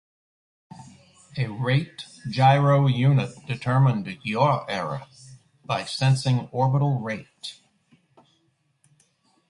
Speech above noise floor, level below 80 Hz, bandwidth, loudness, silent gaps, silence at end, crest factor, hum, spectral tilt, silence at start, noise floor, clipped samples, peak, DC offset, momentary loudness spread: 46 dB; -60 dBFS; 11 kHz; -23 LUFS; none; 1.95 s; 20 dB; none; -7 dB/octave; 0.75 s; -68 dBFS; under 0.1%; -6 dBFS; under 0.1%; 17 LU